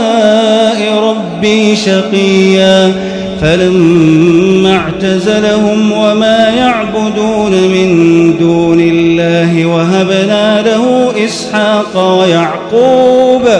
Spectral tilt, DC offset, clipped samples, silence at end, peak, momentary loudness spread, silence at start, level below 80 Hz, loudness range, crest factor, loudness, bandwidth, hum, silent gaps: -5.5 dB/octave; under 0.1%; 2%; 0 s; 0 dBFS; 5 LU; 0 s; -40 dBFS; 1 LU; 8 dB; -8 LUFS; 10.5 kHz; none; none